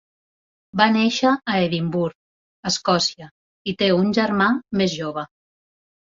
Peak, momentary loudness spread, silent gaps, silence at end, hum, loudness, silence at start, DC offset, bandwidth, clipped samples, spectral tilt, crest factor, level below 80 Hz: -2 dBFS; 12 LU; 2.15-2.63 s, 3.31-3.65 s; 0.8 s; none; -20 LUFS; 0.75 s; under 0.1%; 7.8 kHz; under 0.1%; -4.5 dB/octave; 20 dB; -60 dBFS